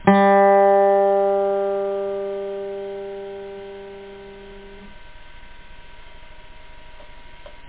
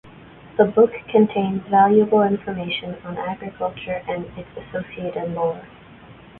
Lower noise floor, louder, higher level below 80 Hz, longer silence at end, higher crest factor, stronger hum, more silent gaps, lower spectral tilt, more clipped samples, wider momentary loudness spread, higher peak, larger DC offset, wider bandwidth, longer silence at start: second, -39 dBFS vs -44 dBFS; first, -18 LUFS vs -21 LUFS; about the same, -50 dBFS vs -54 dBFS; second, 0 s vs 0.25 s; about the same, 20 dB vs 20 dB; neither; neither; about the same, -10.5 dB/octave vs -11 dB/octave; neither; first, 26 LU vs 15 LU; about the same, -2 dBFS vs -2 dBFS; first, 0.1% vs under 0.1%; about the same, 4 kHz vs 4.1 kHz; about the same, 0 s vs 0.05 s